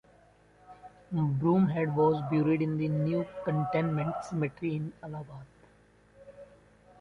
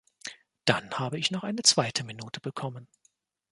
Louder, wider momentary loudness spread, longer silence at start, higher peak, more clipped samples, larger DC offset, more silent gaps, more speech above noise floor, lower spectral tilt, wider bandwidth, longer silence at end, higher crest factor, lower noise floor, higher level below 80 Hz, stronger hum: second, -30 LUFS vs -27 LUFS; second, 14 LU vs 20 LU; first, 0.7 s vs 0.25 s; second, -14 dBFS vs -4 dBFS; neither; neither; neither; second, 32 dB vs 41 dB; first, -9 dB/octave vs -2.5 dB/octave; second, 7.2 kHz vs 11.5 kHz; about the same, 0.55 s vs 0.65 s; second, 16 dB vs 28 dB; second, -61 dBFS vs -70 dBFS; first, -62 dBFS vs -68 dBFS; neither